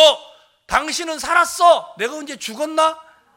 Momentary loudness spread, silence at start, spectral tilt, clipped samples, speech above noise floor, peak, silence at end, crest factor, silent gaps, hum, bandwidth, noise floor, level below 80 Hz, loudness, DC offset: 14 LU; 0 s; -1 dB/octave; under 0.1%; 28 dB; 0 dBFS; 0.35 s; 18 dB; none; none; 17 kHz; -46 dBFS; -50 dBFS; -18 LUFS; under 0.1%